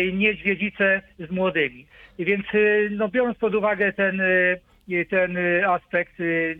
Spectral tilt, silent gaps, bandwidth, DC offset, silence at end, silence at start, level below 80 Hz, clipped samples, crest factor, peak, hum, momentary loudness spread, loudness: -8.5 dB/octave; none; 4.1 kHz; under 0.1%; 0 s; 0 s; -56 dBFS; under 0.1%; 16 dB; -6 dBFS; none; 7 LU; -22 LUFS